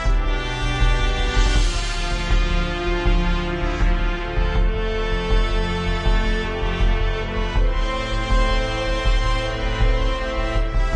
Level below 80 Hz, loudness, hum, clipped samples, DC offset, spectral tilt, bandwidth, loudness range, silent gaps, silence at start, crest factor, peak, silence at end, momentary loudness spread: -20 dBFS; -23 LUFS; none; under 0.1%; under 0.1%; -5 dB/octave; 9.2 kHz; 1 LU; none; 0 s; 14 dB; -6 dBFS; 0 s; 3 LU